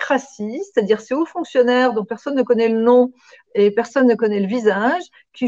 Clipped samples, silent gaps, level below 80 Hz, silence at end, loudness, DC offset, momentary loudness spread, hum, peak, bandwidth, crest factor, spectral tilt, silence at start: under 0.1%; none; -66 dBFS; 0 s; -18 LUFS; under 0.1%; 9 LU; none; -4 dBFS; 7.8 kHz; 14 dB; -6 dB/octave; 0 s